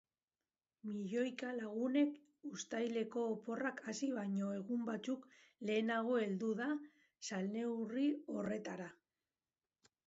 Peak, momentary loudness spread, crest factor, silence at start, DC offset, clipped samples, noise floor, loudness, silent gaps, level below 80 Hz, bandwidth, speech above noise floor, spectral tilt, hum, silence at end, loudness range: -24 dBFS; 11 LU; 16 dB; 0.85 s; under 0.1%; under 0.1%; under -90 dBFS; -41 LUFS; none; -88 dBFS; 7.6 kHz; over 50 dB; -5 dB/octave; none; 1.1 s; 2 LU